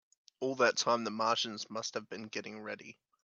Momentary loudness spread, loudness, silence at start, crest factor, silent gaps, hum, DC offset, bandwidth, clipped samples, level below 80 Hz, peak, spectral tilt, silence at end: 14 LU; -34 LUFS; 0.4 s; 22 dB; none; none; under 0.1%; 8.4 kHz; under 0.1%; -86 dBFS; -14 dBFS; -2.5 dB/octave; 0.3 s